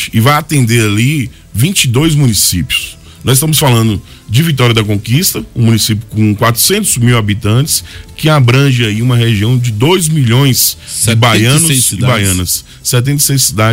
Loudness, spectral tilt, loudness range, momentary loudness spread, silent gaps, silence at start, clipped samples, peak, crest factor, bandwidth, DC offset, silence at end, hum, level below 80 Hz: -10 LUFS; -4 dB/octave; 2 LU; 6 LU; none; 0 s; under 0.1%; 0 dBFS; 10 dB; 16.5 kHz; under 0.1%; 0 s; none; -34 dBFS